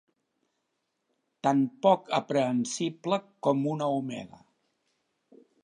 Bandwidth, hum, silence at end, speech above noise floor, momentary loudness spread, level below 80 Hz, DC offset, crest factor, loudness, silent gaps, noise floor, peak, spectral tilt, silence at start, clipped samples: 10.5 kHz; none; 1.4 s; 52 dB; 8 LU; -80 dBFS; under 0.1%; 22 dB; -28 LUFS; none; -80 dBFS; -8 dBFS; -5.5 dB/octave; 1.45 s; under 0.1%